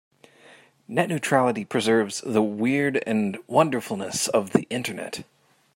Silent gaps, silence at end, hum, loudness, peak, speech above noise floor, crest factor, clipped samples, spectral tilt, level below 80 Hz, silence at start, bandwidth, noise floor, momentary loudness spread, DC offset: none; 0.55 s; none; -24 LUFS; -2 dBFS; 29 dB; 22 dB; under 0.1%; -4.5 dB/octave; -70 dBFS; 0.9 s; 16.5 kHz; -53 dBFS; 8 LU; under 0.1%